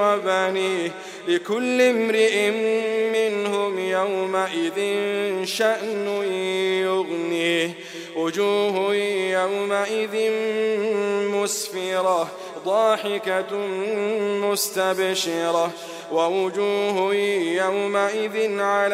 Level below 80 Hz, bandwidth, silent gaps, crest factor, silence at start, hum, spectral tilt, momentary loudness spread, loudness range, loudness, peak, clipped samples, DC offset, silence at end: -74 dBFS; 16 kHz; none; 16 dB; 0 s; none; -3.5 dB/octave; 5 LU; 2 LU; -22 LUFS; -6 dBFS; under 0.1%; under 0.1%; 0 s